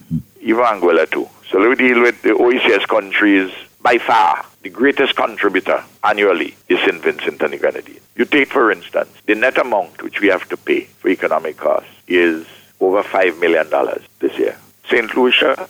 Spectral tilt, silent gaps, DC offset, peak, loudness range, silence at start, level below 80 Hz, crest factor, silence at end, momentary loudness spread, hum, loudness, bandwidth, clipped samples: -5 dB/octave; none; under 0.1%; -2 dBFS; 4 LU; 0.1 s; -58 dBFS; 14 dB; 0.05 s; 9 LU; none; -16 LUFS; 17.5 kHz; under 0.1%